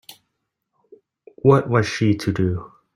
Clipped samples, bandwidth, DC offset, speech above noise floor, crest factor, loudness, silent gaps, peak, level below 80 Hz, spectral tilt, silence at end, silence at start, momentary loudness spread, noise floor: under 0.1%; 15.5 kHz; under 0.1%; 59 dB; 20 dB; -20 LUFS; none; -2 dBFS; -52 dBFS; -7 dB/octave; 0.3 s; 0.1 s; 7 LU; -77 dBFS